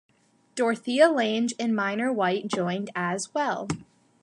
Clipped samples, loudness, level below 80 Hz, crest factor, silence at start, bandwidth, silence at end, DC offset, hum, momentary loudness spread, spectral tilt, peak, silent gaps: under 0.1%; -26 LUFS; -64 dBFS; 20 dB; 0.55 s; 11.5 kHz; 0.4 s; under 0.1%; none; 10 LU; -4.5 dB/octave; -6 dBFS; none